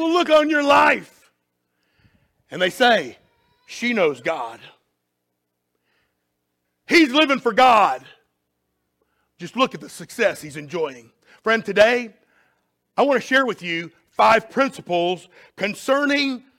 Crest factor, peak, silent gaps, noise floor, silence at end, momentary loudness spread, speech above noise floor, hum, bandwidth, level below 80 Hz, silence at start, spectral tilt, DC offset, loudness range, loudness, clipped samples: 18 dB; -4 dBFS; none; -76 dBFS; 0.2 s; 17 LU; 57 dB; 60 Hz at -55 dBFS; 16.5 kHz; -64 dBFS; 0 s; -4 dB/octave; under 0.1%; 8 LU; -19 LUFS; under 0.1%